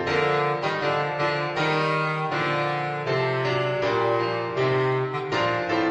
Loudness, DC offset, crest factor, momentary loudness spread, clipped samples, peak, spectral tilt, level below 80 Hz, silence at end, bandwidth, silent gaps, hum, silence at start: -24 LUFS; under 0.1%; 14 dB; 3 LU; under 0.1%; -10 dBFS; -6 dB/octave; -60 dBFS; 0 s; 9.6 kHz; none; none; 0 s